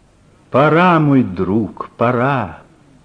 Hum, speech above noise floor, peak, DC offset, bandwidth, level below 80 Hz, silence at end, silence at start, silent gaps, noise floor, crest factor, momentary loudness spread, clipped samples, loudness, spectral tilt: none; 36 dB; -2 dBFS; under 0.1%; 9 kHz; -50 dBFS; 0.5 s; 0.5 s; none; -50 dBFS; 14 dB; 10 LU; under 0.1%; -15 LUFS; -9 dB/octave